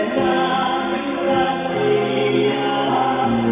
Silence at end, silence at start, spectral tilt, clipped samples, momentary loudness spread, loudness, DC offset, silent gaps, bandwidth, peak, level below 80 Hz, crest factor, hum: 0 s; 0 s; -9.5 dB/octave; under 0.1%; 2 LU; -19 LUFS; under 0.1%; none; 3.9 kHz; -6 dBFS; -50 dBFS; 12 dB; none